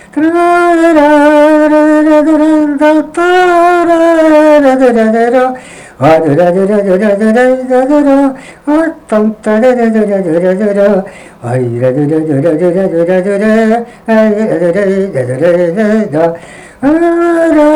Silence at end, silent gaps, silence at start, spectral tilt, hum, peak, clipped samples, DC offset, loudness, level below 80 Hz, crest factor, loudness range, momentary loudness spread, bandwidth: 0 s; none; 0.15 s; -7 dB/octave; none; 0 dBFS; under 0.1%; under 0.1%; -8 LUFS; -44 dBFS; 8 dB; 4 LU; 7 LU; 12 kHz